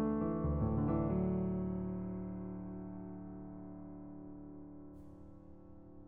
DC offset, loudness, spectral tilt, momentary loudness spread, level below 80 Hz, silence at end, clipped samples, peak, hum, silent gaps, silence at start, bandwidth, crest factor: 0.1%; -39 LUFS; -12 dB/octave; 21 LU; -50 dBFS; 0 s; under 0.1%; -24 dBFS; none; none; 0 s; 3 kHz; 16 dB